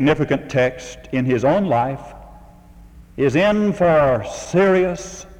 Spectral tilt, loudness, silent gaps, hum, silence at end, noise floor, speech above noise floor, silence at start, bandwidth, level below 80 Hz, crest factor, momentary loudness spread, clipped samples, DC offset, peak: -6.5 dB/octave; -18 LUFS; none; none; 0.15 s; -44 dBFS; 26 dB; 0 s; 11.5 kHz; -44 dBFS; 16 dB; 14 LU; under 0.1%; under 0.1%; -2 dBFS